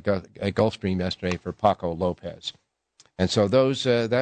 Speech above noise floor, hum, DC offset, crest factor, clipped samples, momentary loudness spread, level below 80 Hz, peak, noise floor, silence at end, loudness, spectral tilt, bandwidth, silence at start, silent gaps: 37 dB; none; under 0.1%; 18 dB; under 0.1%; 13 LU; -56 dBFS; -6 dBFS; -61 dBFS; 0 s; -25 LUFS; -6 dB/octave; 9.2 kHz; 0.05 s; none